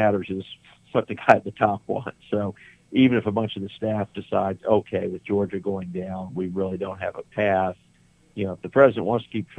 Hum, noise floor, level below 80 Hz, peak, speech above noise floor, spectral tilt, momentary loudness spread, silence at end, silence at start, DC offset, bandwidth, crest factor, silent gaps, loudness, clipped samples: none; -58 dBFS; -62 dBFS; 0 dBFS; 35 dB; -8 dB/octave; 12 LU; 0.05 s; 0 s; under 0.1%; 9.4 kHz; 24 dB; none; -24 LUFS; under 0.1%